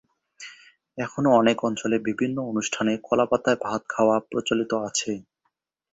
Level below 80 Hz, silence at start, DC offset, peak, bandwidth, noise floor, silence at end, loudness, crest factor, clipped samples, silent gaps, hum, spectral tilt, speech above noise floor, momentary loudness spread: -64 dBFS; 0.4 s; under 0.1%; -4 dBFS; 8 kHz; -76 dBFS; 0.7 s; -24 LUFS; 20 dB; under 0.1%; none; none; -4.5 dB/octave; 52 dB; 16 LU